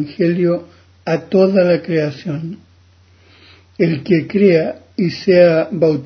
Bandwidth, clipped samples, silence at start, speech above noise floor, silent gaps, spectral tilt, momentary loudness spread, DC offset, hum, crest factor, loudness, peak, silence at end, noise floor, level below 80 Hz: 6.4 kHz; under 0.1%; 0 s; 35 dB; none; -8.5 dB/octave; 13 LU; under 0.1%; none; 16 dB; -15 LUFS; 0 dBFS; 0 s; -49 dBFS; -54 dBFS